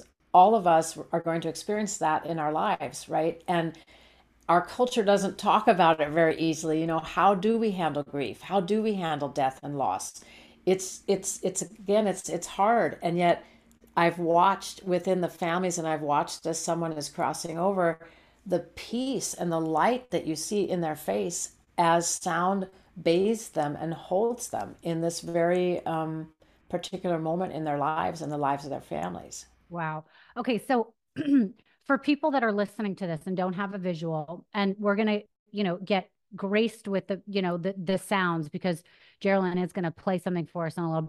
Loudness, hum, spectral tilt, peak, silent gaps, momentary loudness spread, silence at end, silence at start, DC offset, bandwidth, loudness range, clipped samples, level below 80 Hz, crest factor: -28 LUFS; none; -5 dB/octave; -8 dBFS; 35.39-35.46 s; 10 LU; 0 s; 0 s; under 0.1%; 15.5 kHz; 5 LU; under 0.1%; -64 dBFS; 20 dB